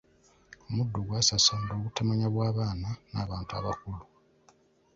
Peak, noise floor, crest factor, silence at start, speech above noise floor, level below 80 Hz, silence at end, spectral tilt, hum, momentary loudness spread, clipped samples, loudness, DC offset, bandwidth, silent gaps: -10 dBFS; -64 dBFS; 22 dB; 0.7 s; 34 dB; -50 dBFS; 0.95 s; -4 dB/octave; none; 13 LU; under 0.1%; -29 LUFS; under 0.1%; 7.8 kHz; none